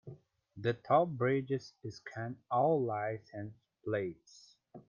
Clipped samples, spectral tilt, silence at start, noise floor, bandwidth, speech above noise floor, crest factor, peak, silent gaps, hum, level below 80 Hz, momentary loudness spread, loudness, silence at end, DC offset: under 0.1%; -7.5 dB/octave; 0.05 s; -55 dBFS; 7.2 kHz; 20 dB; 20 dB; -16 dBFS; none; none; -74 dBFS; 17 LU; -34 LUFS; 0.1 s; under 0.1%